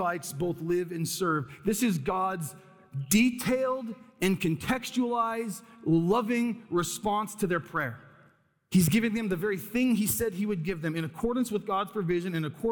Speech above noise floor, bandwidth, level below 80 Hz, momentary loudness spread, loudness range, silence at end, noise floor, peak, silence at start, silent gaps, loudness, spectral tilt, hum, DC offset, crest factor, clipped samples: 35 dB; 19.5 kHz; -56 dBFS; 8 LU; 1 LU; 0 s; -64 dBFS; -12 dBFS; 0 s; none; -29 LUFS; -5 dB/octave; none; under 0.1%; 18 dB; under 0.1%